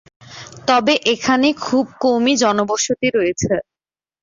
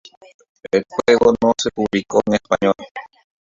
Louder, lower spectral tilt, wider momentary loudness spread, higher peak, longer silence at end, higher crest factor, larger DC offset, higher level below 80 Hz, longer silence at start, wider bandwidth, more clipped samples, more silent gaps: about the same, -17 LUFS vs -18 LUFS; about the same, -3.5 dB/octave vs -4.5 dB/octave; about the same, 8 LU vs 10 LU; about the same, -2 dBFS vs -2 dBFS; about the same, 0.6 s vs 0.55 s; about the same, 16 dB vs 18 dB; neither; about the same, -52 dBFS vs -50 dBFS; second, 0.3 s vs 0.65 s; about the same, 7.6 kHz vs 7.6 kHz; neither; second, none vs 2.91-2.95 s